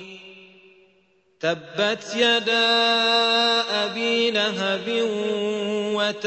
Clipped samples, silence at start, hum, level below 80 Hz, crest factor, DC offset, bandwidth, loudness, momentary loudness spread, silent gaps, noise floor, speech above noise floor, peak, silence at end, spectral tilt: under 0.1%; 0 s; none; -72 dBFS; 16 dB; under 0.1%; 8.4 kHz; -21 LUFS; 8 LU; none; -62 dBFS; 40 dB; -8 dBFS; 0 s; -3 dB/octave